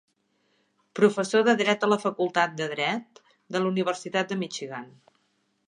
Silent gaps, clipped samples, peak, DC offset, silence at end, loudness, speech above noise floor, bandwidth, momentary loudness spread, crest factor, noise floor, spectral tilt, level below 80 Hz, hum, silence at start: none; under 0.1%; -6 dBFS; under 0.1%; 0.8 s; -25 LUFS; 46 dB; 10.5 kHz; 12 LU; 20 dB; -72 dBFS; -4.5 dB/octave; -80 dBFS; none; 0.95 s